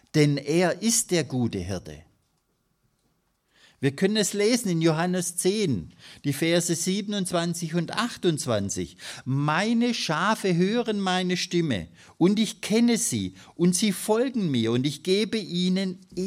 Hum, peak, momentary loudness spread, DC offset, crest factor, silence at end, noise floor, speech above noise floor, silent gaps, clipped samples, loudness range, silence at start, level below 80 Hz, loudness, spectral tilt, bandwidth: none; -8 dBFS; 8 LU; under 0.1%; 18 dB; 0 s; -72 dBFS; 47 dB; none; under 0.1%; 3 LU; 0.15 s; -62 dBFS; -25 LUFS; -4.5 dB/octave; 15.5 kHz